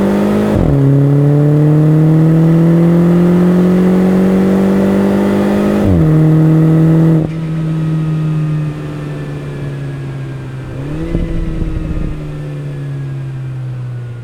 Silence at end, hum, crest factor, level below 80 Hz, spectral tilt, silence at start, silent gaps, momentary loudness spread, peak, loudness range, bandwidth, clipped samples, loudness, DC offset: 0 s; none; 12 dB; -28 dBFS; -9.5 dB/octave; 0 s; none; 13 LU; 0 dBFS; 12 LU; 9.6 kHz; under 0.1%; -12 LUFS; under 0.1%